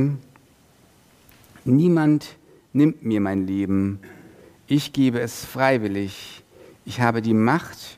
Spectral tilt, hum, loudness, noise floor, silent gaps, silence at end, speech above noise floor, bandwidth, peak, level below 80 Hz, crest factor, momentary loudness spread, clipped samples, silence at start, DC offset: -7 dB/octave; none; -22 LUFS; -55 dBFS; none; 0.05 s; 34 dB; 15.5 kHz; -2 dBFS; -60 dBFS; 20 dB; 15 LU; under 0.1%; 0 s; under 0.1%